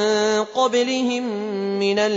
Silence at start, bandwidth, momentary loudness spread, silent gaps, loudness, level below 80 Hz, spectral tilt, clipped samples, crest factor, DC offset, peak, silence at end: 0 s; 8 kHz; 6 LU; none; -21 LUFS; -66 dBFS; -4 dB/octave; under 0.1%; 14 dB; under 0.1%; -8 dBFS; 0 s